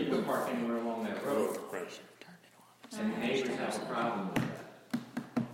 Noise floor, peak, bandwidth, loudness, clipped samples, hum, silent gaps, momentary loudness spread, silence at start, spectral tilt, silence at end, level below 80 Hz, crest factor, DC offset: -60 dBFS; -16 dBFS; 16 kHz; -35 LUFS; under 0.1%; none; none; 14 LU; 0 s; -5.5 dB/octave; 0 s; -72 dBFS; 18 dB; under 0.1%